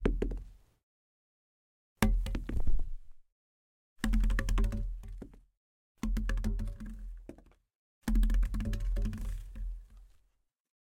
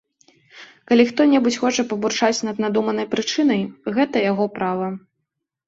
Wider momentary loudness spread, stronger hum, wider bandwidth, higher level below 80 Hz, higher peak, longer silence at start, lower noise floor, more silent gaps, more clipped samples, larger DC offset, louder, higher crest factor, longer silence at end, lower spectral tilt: first, 17 LU vs 7 LU; neither; first, 16 kHz vs 8 kHz; first, -34 dBFS vs -64 dBFS; second, -8 dBFS vs -4 dBFS; second, 0 s vs 0.55 s; about the same, -75 dBFS vs -78 dBFS; first, 0.83-1.96 s, 3.32-3.96 s, 5.57-5.95 s, 7.75-8.01 s vs none; neither; neither; second, -36 LUFS vs -20 LUFS; first, 24 dB vs 18 dB; about the same, 0.8 s vs 0.7 s; first, -6 dB/octave vs -4.5 dB/octave